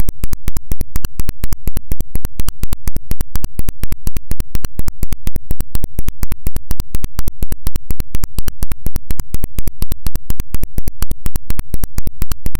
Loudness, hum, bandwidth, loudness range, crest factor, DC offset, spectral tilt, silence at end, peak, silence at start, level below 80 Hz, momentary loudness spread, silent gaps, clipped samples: -26 LUFS; none; 17.5 kHz; 0 LU; 6 dB; under 0.1%; -5 dB/octave; 0.05 s; 0 dBFS; 0 s; -20 dBFS; 1 LU; none; under 0.1%